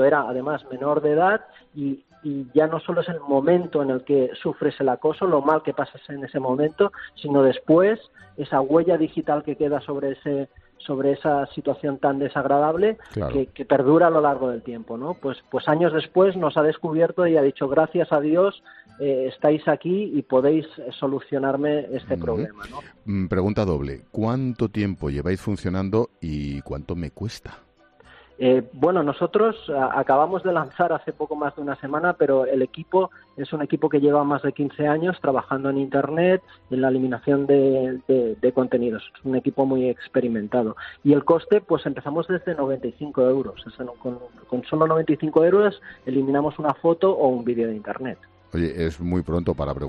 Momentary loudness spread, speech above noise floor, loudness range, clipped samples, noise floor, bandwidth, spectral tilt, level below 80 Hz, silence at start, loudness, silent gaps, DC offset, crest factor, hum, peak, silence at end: 12 LU; 30 dB; 4 LU; under 0.1%; -52 dBFS; 7.8 kHz; -8.5 dB/octave; -48 dBFS; 0 s; -22 LUFS; none; under 0.1%; 16 dB; none; -6 dBFS; 0 s